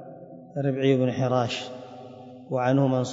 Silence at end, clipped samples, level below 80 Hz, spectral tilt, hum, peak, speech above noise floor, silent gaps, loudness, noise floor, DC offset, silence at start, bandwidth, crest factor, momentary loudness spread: 0 s; under 0.1%; -70 dBFS; -7 dB/octave; none; -8 dBFS; 20 dB; none; -25 LUFS; -44 dBFS; under 0.1%; 0 s; 7.8 kHz; 18 dB; 21 LU